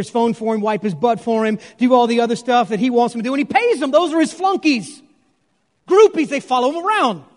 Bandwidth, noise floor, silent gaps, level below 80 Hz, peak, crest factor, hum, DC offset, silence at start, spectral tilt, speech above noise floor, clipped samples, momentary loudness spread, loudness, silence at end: 11 kHz; -66 dBFS; none; -68 dBFS; 0 dBFS; 16 dB; none; under 0.1%; 0 s; -5 dB/octave; 49 dB; under 0.1%; 6 LU; -17 LUFS; 0.15 s